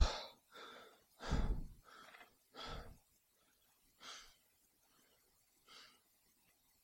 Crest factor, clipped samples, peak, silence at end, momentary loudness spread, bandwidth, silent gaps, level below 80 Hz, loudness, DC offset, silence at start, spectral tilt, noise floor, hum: 28 dB; under 0.1%; -18 dBFS; 1 s; 20 LU; 16.5 kHz; none; -50 dBFS; -48 LUFS; under 0.1%; 0 s; -4.5 dB/octave; -76 dBFS; none